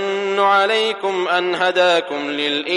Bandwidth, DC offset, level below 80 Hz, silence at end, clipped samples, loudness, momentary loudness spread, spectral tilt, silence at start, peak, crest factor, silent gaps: 11.5 kHz; under 0.1%; -74 dBFS; 0 s; under 0.1%; -17 LUFS; 6 LU; -3 dB/octave; 0 s; -4 dBFS; 14 dB; none